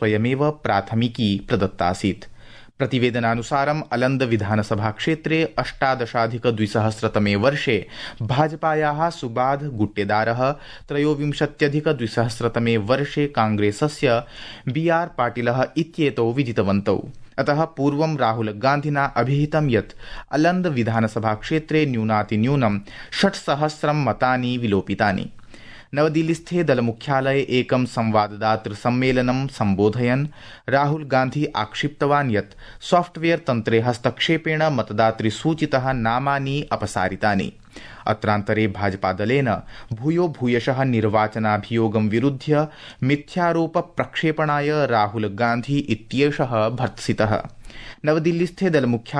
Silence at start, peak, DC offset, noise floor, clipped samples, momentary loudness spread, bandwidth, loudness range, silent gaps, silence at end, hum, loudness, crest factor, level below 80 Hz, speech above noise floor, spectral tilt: 0 s; -4 dBFS; under 0.1%; -41 dBFS; under 0.1%; 5 LU; 11 kHz; 1 LU; none; 0 s; none; -21 LUFS; 18 dB; -48 dBFS; 20 dB; -6.5 dB/octave